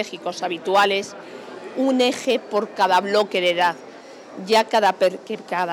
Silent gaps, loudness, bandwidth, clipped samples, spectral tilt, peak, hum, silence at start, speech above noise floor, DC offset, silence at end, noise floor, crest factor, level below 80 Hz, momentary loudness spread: none; -20 LUFS; 19 kHz; under 0.1%; -3.5 dB/octave; -4 dBFS; none; 0 s; 19 dB; under 0.1%; 0 s; -40 dBFS; 16 dB; -84 dBFS; 18 LU